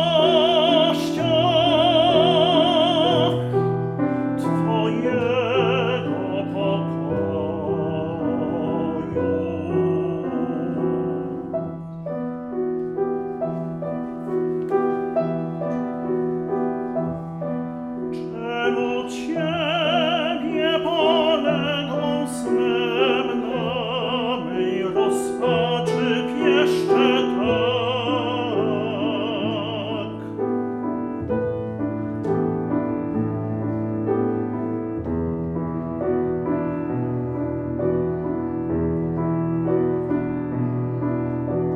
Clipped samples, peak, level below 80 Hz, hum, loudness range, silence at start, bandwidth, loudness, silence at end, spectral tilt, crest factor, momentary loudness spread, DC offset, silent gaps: under 0.1%; -6 dBFS; -50 dBFS; none; 7 LU; 0 s; 13 kHz; -22 LUFS; 0 s; -6.5 dB/octave; 16 dB; 9 LU; under 0.1%; none